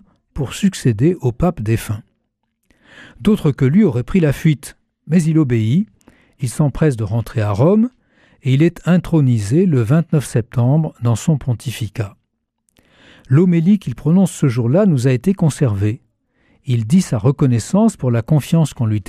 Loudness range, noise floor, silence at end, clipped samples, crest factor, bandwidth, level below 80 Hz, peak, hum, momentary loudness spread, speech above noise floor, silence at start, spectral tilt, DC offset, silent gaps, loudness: 3 LU; -70 dBFS; 0.05 s; under 0.1%; 12 dB; 14.5 kHz; -40 dBFS; -4 dBFS; none; 10 LU; 55 dB; 0.35 s; -7.5 dB/octave; under 0.1%; none; -16 LUFS